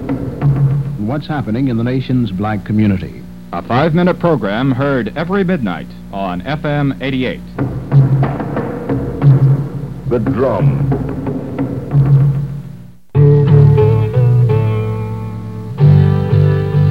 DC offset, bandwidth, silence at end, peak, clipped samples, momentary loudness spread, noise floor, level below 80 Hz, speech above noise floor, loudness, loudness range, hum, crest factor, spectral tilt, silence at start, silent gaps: 1%; 5 kHz; 0 s; 0 dBFS; under 0.1%; 12 LU; -33 dBFS; -34 dBFS; 18 dB; -14 LUFS; 5 LU; 60 Hz at -35 dBFS; 14 dB; -10 dB/octave; 0 s; none